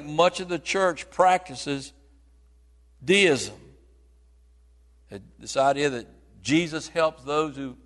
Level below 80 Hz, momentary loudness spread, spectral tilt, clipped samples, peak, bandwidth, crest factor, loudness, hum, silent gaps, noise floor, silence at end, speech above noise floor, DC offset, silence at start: -56 dBFS; 17 LU; -4 dB/octave; under 0.1%; -6 dBFS; 11.5 kHz; 22 dB; -24 LUFS; none; none; -56 dBFS; 0.1 s; 32 dB; under 0.1%; 0 s